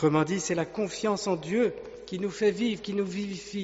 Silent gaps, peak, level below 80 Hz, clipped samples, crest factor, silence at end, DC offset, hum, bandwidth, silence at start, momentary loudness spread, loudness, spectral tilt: none; -12 dBFS; -62 dBFS; under 0.1%; 16 dB; 0 s; under 0.1%; none; 8 kHz; 0 s; 8 LU; -29 LUFS; -5 dB/octave